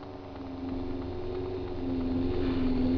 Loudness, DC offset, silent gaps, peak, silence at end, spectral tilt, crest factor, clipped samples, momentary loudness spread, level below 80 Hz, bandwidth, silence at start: -33 LUFS; 0.1%; none; -18 dBFS; 0 s; -9.5 dB/octave; 12 dB; under 0.1%; 10 LU; -40 dBFS; 5.4 kHz; 0 s